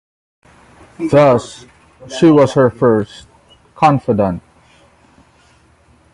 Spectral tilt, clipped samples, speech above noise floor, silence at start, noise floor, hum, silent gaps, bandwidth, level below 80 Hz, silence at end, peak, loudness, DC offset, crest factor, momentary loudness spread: -7 dB/octave; under 0.1%; 38 dB; 1 s; -50 dBFS; none; none; 11.5 kHz; -46 dBFS; 1.75 s; 0 dBFS; -13 LUFS; under 0.1%; 16 dB; 18 LU